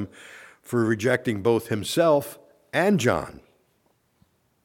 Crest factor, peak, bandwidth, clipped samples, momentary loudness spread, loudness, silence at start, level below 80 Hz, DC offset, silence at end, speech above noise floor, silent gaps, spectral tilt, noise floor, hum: 18 dB; -8 dBFS; 18 kHz; under 0.1%; 19 LU; -23 LUFS; 0 s; -58 dBFS; under 0.1%; 1.35 s; 44 dB; none; -5.5 dB/octave; -67 dBFS; none